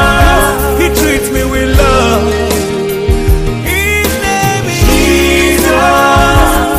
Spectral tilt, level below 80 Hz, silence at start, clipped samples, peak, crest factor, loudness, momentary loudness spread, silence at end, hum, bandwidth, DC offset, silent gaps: -4.5 dB/octave; -16 dBFS; 0 s; 0.2%; 0 dBFS; 8 dB; -9 LUFS; 5 LU; 0 s; none; 16.5 kHz; under 0.1%; none